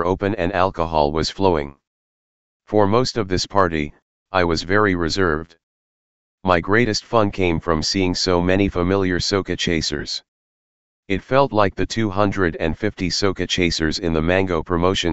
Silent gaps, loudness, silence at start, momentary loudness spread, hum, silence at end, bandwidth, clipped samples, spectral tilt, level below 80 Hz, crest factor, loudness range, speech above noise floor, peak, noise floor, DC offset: 1.87-2.60 s, 4.02-4.26 s, 5.63-6.38 s, 10.28-11.03 s; -20 LUFS; 0 s; 6 LU; none; 0 s; 8.2 kHz; under 0.1%; -5 dB/octave; -38 dBFS; 20 dB; 2 LU; over 71 dB; 0 dBFS; under -90 dBFS; 2%